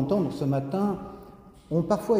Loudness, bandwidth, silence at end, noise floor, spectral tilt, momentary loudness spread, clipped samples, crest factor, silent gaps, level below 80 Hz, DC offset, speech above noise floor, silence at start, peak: -28 LUFS; 16 kHz; 0 s; -48 dBFS; -8.5 dB/octave; 13 LU; under 0.1%; 18 dB; none; -54 dBFS; under 0.1%; 23 dB; 0 s; -10 dBFS